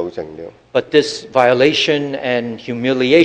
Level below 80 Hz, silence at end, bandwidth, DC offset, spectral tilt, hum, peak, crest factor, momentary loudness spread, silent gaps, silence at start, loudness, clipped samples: -56 dBFS; 0 s; 9.6 kHz; under 0.1%; -4.5 dB/octave; none; 0 dBFS; 16 dB; 14 LU; none; 0 s; -16 LUFS; under 0.1%